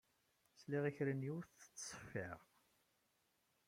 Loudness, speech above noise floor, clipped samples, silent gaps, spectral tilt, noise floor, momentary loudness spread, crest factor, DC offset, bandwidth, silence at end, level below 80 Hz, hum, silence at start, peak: -46 LUFS; 37 dB; under 0.1%; none; -5.5 dB/octave; -82 dBFS; 15 LU; 20 dB; under 0.1%; 16 kHz; 1.25 s; -80 dBFS; none; 0.55 s; -28 dBFS